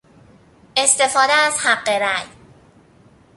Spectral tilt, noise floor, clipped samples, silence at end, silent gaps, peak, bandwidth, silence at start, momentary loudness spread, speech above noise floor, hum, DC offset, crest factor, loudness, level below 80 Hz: 0.5 dB/octave; -51 dBFS; under 0.1%; 1.1 s; none; 0 dBFS; 11.5 kHz; 0.75 s; 9 LU; 34 dB; none; under 0.1%; 20 dB; -16 LUFS; -60 dBFS